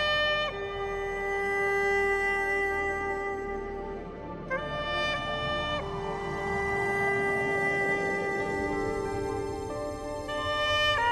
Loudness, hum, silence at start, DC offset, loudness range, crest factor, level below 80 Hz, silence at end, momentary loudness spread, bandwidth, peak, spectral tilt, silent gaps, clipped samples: -29 LUFS; none; 0 s; under 0.1%; 3 LU; 14 dB; -46 dBFS; 0 s; 10 LU; 13 kHz; -16 dBFS; -4 dB/octave; none; under 0.1%